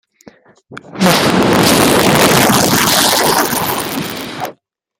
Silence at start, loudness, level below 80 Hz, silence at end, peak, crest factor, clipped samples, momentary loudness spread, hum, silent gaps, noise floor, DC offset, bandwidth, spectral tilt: 0.7 s; -11 LUFS; -42 dBFS; 0.45 s; 0 dBFS; 14 dB; under 0.1%; 14 LU; none; none; -43 dBFS; under 0.1%; over 20 kHz; -3.5 dB/octave